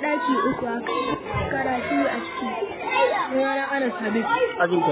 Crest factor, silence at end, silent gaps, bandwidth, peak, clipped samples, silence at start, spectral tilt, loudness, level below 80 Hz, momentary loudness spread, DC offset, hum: 16 dB; 0 s; none; 4 kHz; -8 dBFS; under 0.1%; 0 s; -9.5 dB/octave; -24 LUFS; -48 dBFS; 6 LU; under 0.1%; none